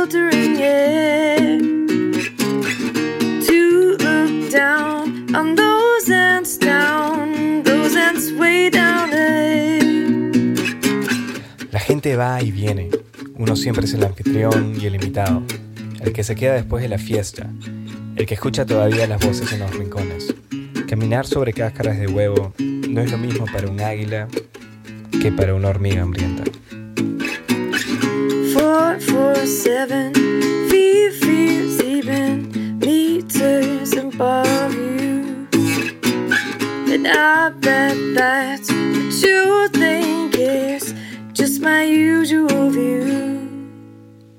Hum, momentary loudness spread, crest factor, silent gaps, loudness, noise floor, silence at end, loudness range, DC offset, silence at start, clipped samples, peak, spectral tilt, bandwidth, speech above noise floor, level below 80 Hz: none; 11 LU; 16 dB; none; -17 LUFS; -42 dBFS; 0.3 s; 6 LU; under 0.1%; 0 s; under 0.1%; 0 dBFS; -5 dB/octave; 17 kHz; 24 dB; -46 dBFS